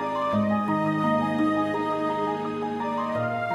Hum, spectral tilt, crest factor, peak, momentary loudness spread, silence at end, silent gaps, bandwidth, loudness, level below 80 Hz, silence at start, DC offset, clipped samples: none; -7.5 dB/octave; 12 dB; -12 dBFS; 4 LU; 0 s; none; 12 kHz; -26 LUFS; -62 dBFS; 0 s; under 0.1%; under 0.1%